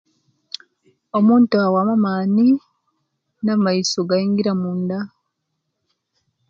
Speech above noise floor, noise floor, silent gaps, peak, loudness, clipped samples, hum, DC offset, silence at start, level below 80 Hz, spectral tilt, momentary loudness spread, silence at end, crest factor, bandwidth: 59 dB; -75 dBFS; none; -4 dBFS; -18 LUFS; under 0.1%; none; under 0.1%; 1.15 s; -68 dBFS; -6 dB/octave; 19 LU; 1.45 s; 16 dB; 7.8 kHz